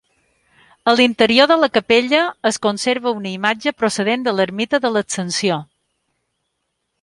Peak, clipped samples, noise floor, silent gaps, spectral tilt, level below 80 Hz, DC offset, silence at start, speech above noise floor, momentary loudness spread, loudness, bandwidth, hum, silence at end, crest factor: 0 dBFS; under 0.1%; -73 dBFS; none; -3.5 dB/octave; -60 dBFS; under 0.1%; 0.85 s; 57 dB; 8 LU; -17 LUFS; 11.5 kHz; none; 1.4 s; 18 dB